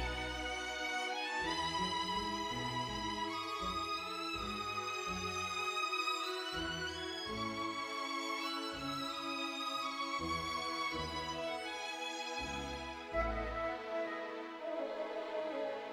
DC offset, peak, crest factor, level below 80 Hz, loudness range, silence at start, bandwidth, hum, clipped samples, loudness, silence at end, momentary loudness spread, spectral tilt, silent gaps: under 0.1%; -24 dBFS; 16 dB; -54 dBFS; 3 LU; 0 s; over 20 kHz; none; under 0.1%; -39 LUFS; 0 s; 5 LU; -3 dB/octave; none